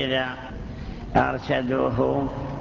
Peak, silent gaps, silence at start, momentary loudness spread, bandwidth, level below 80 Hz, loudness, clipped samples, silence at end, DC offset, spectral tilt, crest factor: -6 dBFS; none; 0 s; 13 LU; 7.2 kHz; -40 dBFS; -24 LUFS; under 0.1%; 0 s; under 0.1%; -7 dB/octave; 20 dB